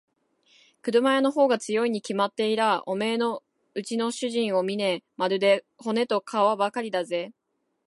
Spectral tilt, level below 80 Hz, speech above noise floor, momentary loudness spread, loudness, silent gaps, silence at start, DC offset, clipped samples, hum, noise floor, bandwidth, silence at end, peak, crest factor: -4.5 dB/octave; -80 dBFS; 52 dB; 9 LU; -25 LUFS; none; 0.85 s; under 0.1%; under 0.1%; none; -77 dBFS; 11.5 kHz; 0.55 s; -8 dBFS; 16 dB